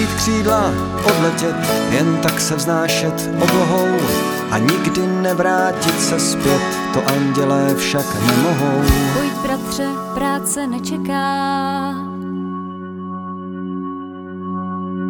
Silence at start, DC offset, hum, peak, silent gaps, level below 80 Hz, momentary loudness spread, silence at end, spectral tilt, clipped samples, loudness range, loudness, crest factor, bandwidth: 0 s; under 0.1%; none; 0 dBFS; none; -36 dBFS; 11 LU; 0 s; -4.5 dB/octave; under 0.1%; 6 LU; -18 LUFS; 16 dB; 19.5 kHz